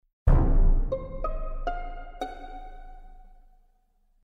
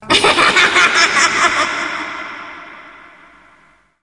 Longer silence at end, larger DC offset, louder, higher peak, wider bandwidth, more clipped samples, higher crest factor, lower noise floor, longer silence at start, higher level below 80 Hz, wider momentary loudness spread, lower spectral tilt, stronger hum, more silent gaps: about the same, 1.05 s vs 1.1 s; neither; second, -30 LUFS vs -11 LUFS; second, -8 dBFS vs 0 dBFS; second, 4 kHz vs 11.5 kHz; neither; about the same, 18 dB vs 16 dB; first, -65 dBFS vs -51 dBFS; first, 0.25 s vs 0 s; first, -26 dBFS vs -50 dBFS; about the same, 21 LU vs 20 LU; first, -9 dB/octave vs -1 dB/octave; neither; neither